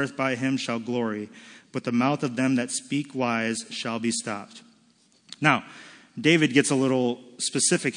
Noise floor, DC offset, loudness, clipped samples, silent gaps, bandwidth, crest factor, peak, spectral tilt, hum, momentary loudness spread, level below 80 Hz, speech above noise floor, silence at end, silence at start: -62 dBFS; under 0.1%; -25 LUFS; under 0.1%; none; 10.5 kHz; 22 dB; -4 dBFS; -4 dB/octave; none; 15 LU; -76 dBFS; 36 dB; 0 s; 0 s